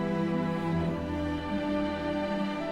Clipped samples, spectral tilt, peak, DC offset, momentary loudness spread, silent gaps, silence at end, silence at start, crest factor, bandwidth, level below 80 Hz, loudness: under 0.1%; -7.5 dB/octave; -18 dBFS; under 0.1%; 3 LU; none; 0 s; 0 s; 12 dB; 11 kHz; -52 dBFS; -31 LUFS